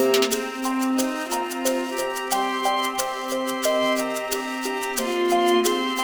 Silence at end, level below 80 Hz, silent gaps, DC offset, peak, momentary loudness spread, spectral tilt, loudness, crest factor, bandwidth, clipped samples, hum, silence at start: 0 s; -60 dBFS; none; under 0.1%; -6 dBFS; 7 LU; -1.5 dB/octave; -23 LUFS; 16 dB; over 20 kHz; under 0.1%; none; 0 s